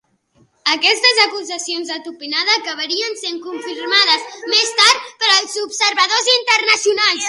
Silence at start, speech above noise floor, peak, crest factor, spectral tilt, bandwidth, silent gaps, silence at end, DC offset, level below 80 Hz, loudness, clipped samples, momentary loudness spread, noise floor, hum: 0.65 s; 40 dB; 0 dBFS; 18 dB; 1.5 dB/octave; 16 kHz; none; 0 s; under 0.1%; -70 dBFS; -14 LUFS; under 0.1%; 13 LU; -57 dBFS; none